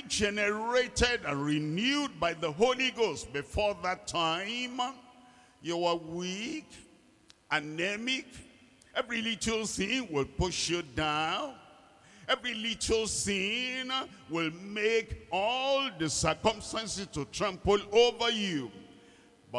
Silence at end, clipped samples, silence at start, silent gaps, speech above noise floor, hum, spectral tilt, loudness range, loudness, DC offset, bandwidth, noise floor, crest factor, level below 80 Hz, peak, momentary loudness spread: 0 s; under 0.1%; 0 s; none; 31 dB; none; -3 dB/octave; 5 LU; -31 LUFS; under 0.1%; 12 kHz; -62 dBFS; 22 dB; -52 dBFS; -12 dBFS; 8 LU